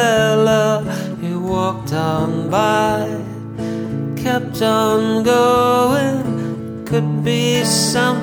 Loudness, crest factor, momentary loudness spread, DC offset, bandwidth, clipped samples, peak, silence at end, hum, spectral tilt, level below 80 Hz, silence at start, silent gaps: -17 LUFS; 14 dB; 10 LU; under 0.1%; over 20 kHz; under 0.1%; -2 dBFS; 0 s; none; -5 dB/octave; -46 dBFS; 0 s; none